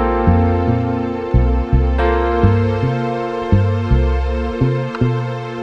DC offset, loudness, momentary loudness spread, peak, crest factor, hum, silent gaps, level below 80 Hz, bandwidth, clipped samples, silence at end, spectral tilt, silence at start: under 0.1%; -17 LUFS; 6 LU; 0 dBFS; 14 dB; none; none; -20 dBFS; 6.6 kHz; under 0.1%; 0 s; -9 dB/octave; 0 s